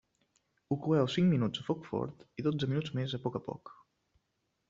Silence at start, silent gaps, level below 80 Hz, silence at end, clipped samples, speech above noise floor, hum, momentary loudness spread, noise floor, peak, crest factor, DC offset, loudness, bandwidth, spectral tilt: 0.7 s; none; -68 dBFS; 1 s; under 0.1%; 49 dB; none; 12 LU; -81 dBFS; -16 dBFS; 18 dB; under 0.1%; -33 LUFS; 7.6 kHz; -6.5 dB/octave